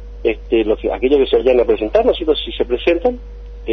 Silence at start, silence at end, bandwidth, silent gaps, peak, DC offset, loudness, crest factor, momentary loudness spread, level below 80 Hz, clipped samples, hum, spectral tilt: 0 s; 0 s; 6.2 kHz; none; -2 dBFS; under 0.1%; -16 LUFS; 14 dB; 8 LU; -32 dBFS; under 0.1%; none; -7.5 dB/octave